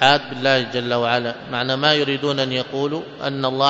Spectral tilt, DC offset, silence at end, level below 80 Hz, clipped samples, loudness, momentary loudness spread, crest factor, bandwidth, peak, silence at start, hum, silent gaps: -5 dB/octave; under 0.1%; 0 s; -60 dBFS; under 0.1%; -20 LUFS; 8 LU; 20 dB; 7.8 kHz; 0 dBFS; 0 s; none; none